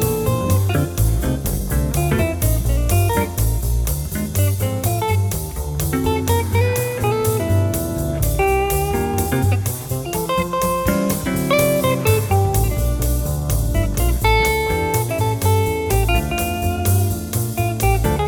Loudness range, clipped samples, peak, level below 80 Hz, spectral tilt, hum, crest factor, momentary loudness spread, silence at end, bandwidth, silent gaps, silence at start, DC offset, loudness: 2 LU; under 0.1%; -2 dBFS; -24 dBFS; -5.5 dB/octave; none; 16 dB; 5 LU; 0 s; over 20 kHz; none; 0 s; under 0.1%; -19 LUFS